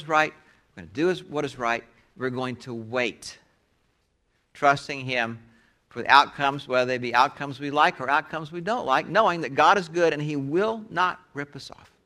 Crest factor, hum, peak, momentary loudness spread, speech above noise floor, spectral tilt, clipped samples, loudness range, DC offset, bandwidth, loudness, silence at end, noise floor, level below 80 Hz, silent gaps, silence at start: 24 dB; none; -2 dBFS; 16 LU; 46 dB; -4.5 dB/octave; under 0.1%; 7 LU; under 0.1%; 13.5 kHz; -24 LUFS; 0.4 s; -70 dBFS; -64 dBFS; none; 0 s